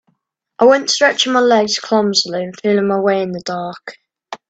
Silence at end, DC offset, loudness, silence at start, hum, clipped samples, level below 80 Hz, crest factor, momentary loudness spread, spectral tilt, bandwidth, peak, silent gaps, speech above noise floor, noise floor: 0.15 s; under 0.1%; -15 LUFS; 0.6 s; none; under 0.1%; -64 dBFS; 16 dB; 14 LU; -3.5 dB/octave; 9 kHz; 0 dBFS; none; 52 dB; -67 dBFS